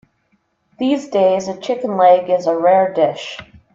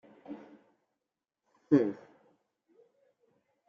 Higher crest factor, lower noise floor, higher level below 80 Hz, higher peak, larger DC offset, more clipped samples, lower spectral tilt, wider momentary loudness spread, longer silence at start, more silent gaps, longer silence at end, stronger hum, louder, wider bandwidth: second, 16 dB vs 24 dB; second, -64 dBFS vs -89 dBFS; first, -60 dBFS vs -84 dBFS; first, -2 dBFS vs -12 dBFS; neither; neither; second, -5.5 dB/octave vs -8.5 dB/octave; second, 11 LU vs 21 LU; first, 0.8 s vs 0.3 s; neither; second, 0.3 s vs 1.7 s; neither; first, -16 LUFS vs -29 LUFS; first, 7.6 kHz vs 6.4 kHz